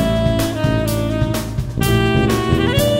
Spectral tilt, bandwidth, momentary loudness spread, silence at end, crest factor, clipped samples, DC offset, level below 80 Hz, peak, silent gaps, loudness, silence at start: -6 dB/octave; 16.5 kHz; 5 LU; 0 s; 14 dB; under 0.1%; under 0.1%; -28 dBFS; -2 dBFS; none; -17 LUFS; 0 s